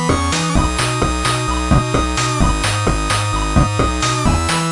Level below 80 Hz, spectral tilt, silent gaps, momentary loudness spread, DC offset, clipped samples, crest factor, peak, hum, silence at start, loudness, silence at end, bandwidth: -22 dBFS; -4.5 dB/octave; none; 2 LU; under 0.1%; under 0.1%; 14 dB; -2 dBFS; none; 0 s; -16 LUFS; 0 s; 11.5 kHz